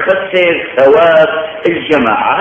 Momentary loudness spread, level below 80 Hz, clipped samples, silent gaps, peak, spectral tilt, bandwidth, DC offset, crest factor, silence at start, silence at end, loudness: 8 LU; -48 dBFS; 0.2%; none; 0 dBFS; -6 dB/octave; 7.6 kHz; under 0.1%; 10 dB; 0 s; 0 s; -10 LUFS